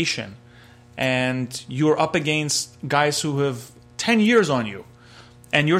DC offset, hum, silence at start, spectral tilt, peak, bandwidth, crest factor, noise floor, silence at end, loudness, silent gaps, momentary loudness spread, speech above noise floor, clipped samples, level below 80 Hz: under 0.1%; none; 0 s; -4.5 dB/octave; -2 dBFS; 15.5 kHz; 20 dB; -48 dBFS; 0 s; -21 LUFS; none; 16 LU; 27 dB; under 0.1%; -58 dBFS